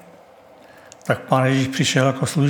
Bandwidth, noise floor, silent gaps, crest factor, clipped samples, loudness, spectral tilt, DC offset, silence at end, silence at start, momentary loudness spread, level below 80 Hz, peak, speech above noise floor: 17.5 kHz; -47 dBFS; none; 20 dB; under 0.1%; -19 LUFS; -5 dB/octave; under 0.1%; 0 s; 1.05 s; 7 LU; -64 dBFS; -2 dBFS; 29 dB